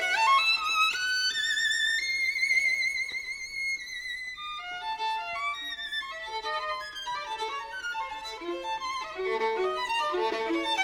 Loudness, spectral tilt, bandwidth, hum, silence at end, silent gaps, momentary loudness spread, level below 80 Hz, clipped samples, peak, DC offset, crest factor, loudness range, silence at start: -28 LUFS; 0 dB/octave; over 20 kHz; none; 0 s; none; 11 LU; -64 dBFS; under 0.1%; -12 dBFS; under 0.1%; 16 dB; 8 LU; 0 s